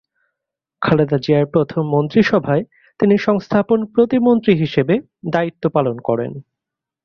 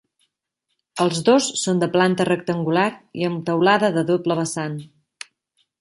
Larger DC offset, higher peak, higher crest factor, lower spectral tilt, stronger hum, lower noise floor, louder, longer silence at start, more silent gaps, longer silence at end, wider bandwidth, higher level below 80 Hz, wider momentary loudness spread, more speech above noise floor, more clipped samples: neither; about the same, -2 dBFS vs -2 dBFS; about the same, 16 dB vs 18 dB; first, -8.5 dB/octave vs -5 dB/octave; neither; first, -84 dBFS vs -77 dBFS; first, -17 LUFS vs -20 LUFS; second, 0.8 s vs 0.95 s; neither; second, 0.65 s vs 0.95 s; second, 6.6 kHz vs 11.5 kHz; first, -52 dBFS vs -66 dBFS; second, 7 LU vs 18 LU; first, 68 dB vs 57 dB; neither